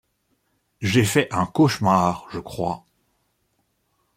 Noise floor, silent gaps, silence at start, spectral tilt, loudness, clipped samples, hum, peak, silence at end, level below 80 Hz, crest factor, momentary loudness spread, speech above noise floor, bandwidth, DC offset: -70 dBFS; none; 0.8 s; -5.5 dB/octave; -21 LUFS; under 0.1%; none; -4 dBFS; 1.4 s; -56 dBFS; 20 dB; 13 LU; 49 dB; 16.5 kHz; under 0.1%